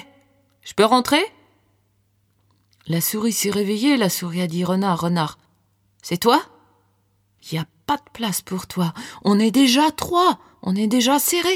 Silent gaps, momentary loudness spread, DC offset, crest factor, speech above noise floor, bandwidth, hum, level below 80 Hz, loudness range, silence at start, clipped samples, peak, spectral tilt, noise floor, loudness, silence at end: none; 12 LU; under 0.1%; 20 dB; 45 dB; 19.5 kHz; none; -58 dBFS; 5 LU; 0.65 s; under 0.1%; -2 dBFS; -4 dB/octave; -64 dBFS; -20 LUFS; 0 s